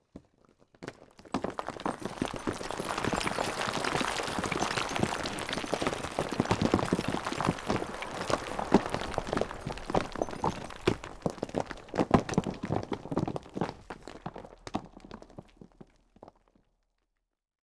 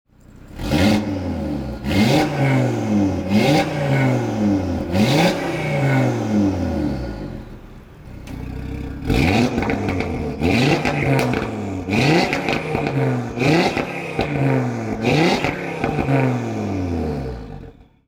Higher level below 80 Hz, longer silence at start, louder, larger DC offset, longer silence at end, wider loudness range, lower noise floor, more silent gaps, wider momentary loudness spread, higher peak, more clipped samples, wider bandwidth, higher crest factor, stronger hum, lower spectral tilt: second, -50 dBFS vs -38 dBFS; second, 0.15 s vs 0.35 s; second, -33 LUFS vs -19 LUFS; neither; first, 1.35 s vs 0.35 s; first, 10 LU vs 5 LU; first, -82 dBFS vs -42 dBFS; neither; first, 16 LU vs 13 LU; second, -10 dBFS vs -2 dBFS; neither; second, 11 kHz vs 19 kHz; first, 24 dB vs 16 dB; neither; second, -5 dB/octave vs -6.5 dB/octave